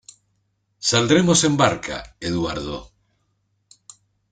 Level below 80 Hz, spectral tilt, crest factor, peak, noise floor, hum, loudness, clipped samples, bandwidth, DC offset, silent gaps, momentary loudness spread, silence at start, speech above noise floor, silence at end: -48 dBFS; -4 dB/octave; 22 dB; -2 dBFS; -69 dBFS; none; -19 LUFS; under 0.1%; 9.6 kHz; under 0.1%; none; 15 LU; 0.8 s; 50 dB; 1.45 s